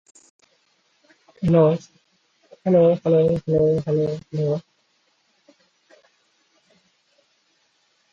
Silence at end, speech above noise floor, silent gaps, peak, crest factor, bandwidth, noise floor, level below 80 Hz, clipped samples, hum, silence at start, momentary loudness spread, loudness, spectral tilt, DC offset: 3.5 s; 47 dB; none; -4 dBFS; 20 dB; 7.8 kHz; -66 dBFS; -54 dBFS; under 0.1%; none; 1.4 s; 10 LU; -20 LUFS; -9.5 dB/octave; under 0.1%